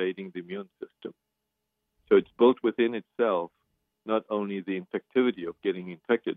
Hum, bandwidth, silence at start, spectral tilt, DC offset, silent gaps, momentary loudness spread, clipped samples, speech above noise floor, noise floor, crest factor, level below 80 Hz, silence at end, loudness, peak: none; 3.9 kHz; 0 s; -9 dB/octave; under 0.1%; none; 19 LU; under 0.1%; 55 dB; -83 dBFS; 20 dB; -74 dBFS; 0.05 s; -28 LUFS; -10 dBFS